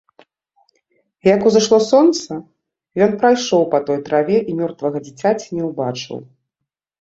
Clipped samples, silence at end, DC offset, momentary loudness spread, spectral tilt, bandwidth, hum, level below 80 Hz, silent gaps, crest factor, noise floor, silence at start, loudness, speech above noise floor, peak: under 0.1%; 0.8 s; under 0.1%; 15 LU; -5 dB/octave; 8 kHz; none; -60 dBFS; none; 16 dB; -81 dBFS; 1.25 s; -16 LUFS; 65 dB; -2 dBFS